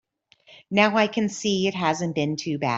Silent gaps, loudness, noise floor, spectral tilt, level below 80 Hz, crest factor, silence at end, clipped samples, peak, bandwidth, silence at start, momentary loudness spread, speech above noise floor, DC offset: none; -23 LUFS; -57 dBFS; -4.5 dB/octave; -64 dBFS; 20 dB; 0 s; under 0.1%; -4 dBFS; 8 kHz; 0.5 s; 7 LU; 34 dB; under 0.1%